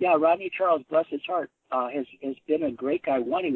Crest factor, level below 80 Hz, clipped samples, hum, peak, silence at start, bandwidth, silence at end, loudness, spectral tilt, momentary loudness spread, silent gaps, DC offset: 16 dB; -70 dBFS; under 0.1%; none; -10 dBFS; 0 s; 4.3 kHz; 0 s; -27 LUFS; -8.5 dB/octave; 9 LU; none; under 0.1%